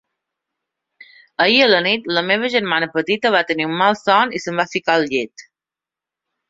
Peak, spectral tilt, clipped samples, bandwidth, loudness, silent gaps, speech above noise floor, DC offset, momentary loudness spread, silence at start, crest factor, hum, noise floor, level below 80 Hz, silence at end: -2 dBFS; -4 dB/octave; under 0.1%; 7.8 kHz; -17 LUFS; none; 71 dB; under 0.1%; 8 LU; 1.4 s; 18 dB; none; -88 dBFS; -64 dBFS; 1.1 s